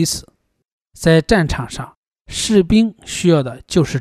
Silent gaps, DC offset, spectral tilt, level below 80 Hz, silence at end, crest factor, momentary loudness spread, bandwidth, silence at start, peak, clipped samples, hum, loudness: 0.72-0.78 s, 1.97-2.03 s, 2.21-2.25 s; under 0.1%; -5 dB/octave; -36 dBFS; 0 s; 16 dB; 14 LU; 15 kHz; 0 s; -2 dBFS; under 0.1%; none; -16 LUFS